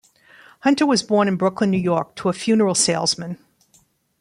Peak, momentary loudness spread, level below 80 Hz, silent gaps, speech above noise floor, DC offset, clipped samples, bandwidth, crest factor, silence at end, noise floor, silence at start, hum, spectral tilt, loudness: -4 dBFS; 8 LU; -60 dBFS; none; 41 dB; under 0.1%; under 0.1%; 12.5 kHz; 16 dB; 0.85 s; -59 dBFS; 0.65 s; none; -4 dB/octave; -19 LUFS